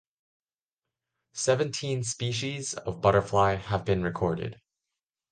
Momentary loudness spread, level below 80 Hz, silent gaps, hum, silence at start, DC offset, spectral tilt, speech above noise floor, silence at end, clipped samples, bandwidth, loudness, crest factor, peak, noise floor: 9 LU; -50 dBFS; none; none; 1.35 s; under 0.1%; -4.5 dB/octave; over 63 dB; 0.75 s; under 0.1%; 10 kHz; -28 LUFS; 20 dB; -8 dBFS; under -90 dBFS